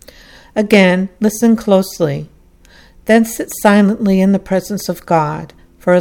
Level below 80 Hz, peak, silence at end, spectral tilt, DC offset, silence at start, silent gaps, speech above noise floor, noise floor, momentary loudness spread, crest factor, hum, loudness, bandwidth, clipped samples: -44 dBFS; 0 dBFS; 0 s; -6 dB/octave; under 0.1%; 0.55 s; none; 32 dB; -45 dBFS; 11 LU; 14 dB; none; -14 LUFS; 17.5 kHz; under 0.1%